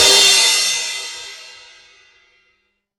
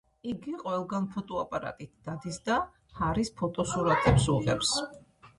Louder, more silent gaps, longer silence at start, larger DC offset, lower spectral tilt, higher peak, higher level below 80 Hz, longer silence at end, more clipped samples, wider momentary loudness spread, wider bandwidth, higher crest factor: first, -12 LUFS vs -30 LUFS; neither; second, 0 s vs 0.25 s; neither; second, 2 dB/octave vs -5 dB/octave; first, 0 dBFS vs -10 dBFS; second, -56 dBFS vs -46 dBFS; first, 1.5 s vs 0.1 s; neither; first, 24 LU vs 15 LU; first, 16.5 kHz vs 11.5 kHz; about the same, 18 dB vs 20 dB